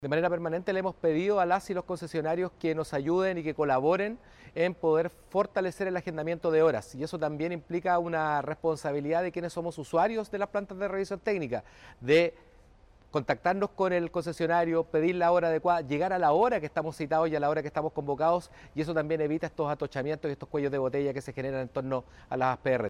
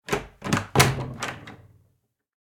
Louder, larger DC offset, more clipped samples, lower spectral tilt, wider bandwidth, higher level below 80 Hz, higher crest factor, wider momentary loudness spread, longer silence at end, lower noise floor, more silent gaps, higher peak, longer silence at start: second, -29 LUFS vs -24 LUFS; neither; neither; first, -6.5 dB/octave vs -4 dB/octave; second, 12 kHz vs 18 kHz; second, -60 dBFS vs -46 dBFS; second, 16 dB vs 26 dB; second, 9 LU vs 18 LU; second, 0 s vs 1.05 s; second, -58 dBFS vs -70 dBFS; neither; second, -14 dBFS vs -2 dBFS; about the same, 0 s vs 0.1 s